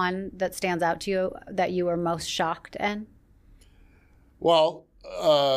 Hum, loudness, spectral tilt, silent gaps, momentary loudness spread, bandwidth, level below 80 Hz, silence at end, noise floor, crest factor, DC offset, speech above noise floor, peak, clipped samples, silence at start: none; -26 LUFS; -4.5 dB/octave; none; 9 LU; 15.5 kHz; -56 dBFS; 0 s; -57 dBFS; 18 dB; under 0.1%; 32 dB; -8 dBFS; under 0.1%; 0 s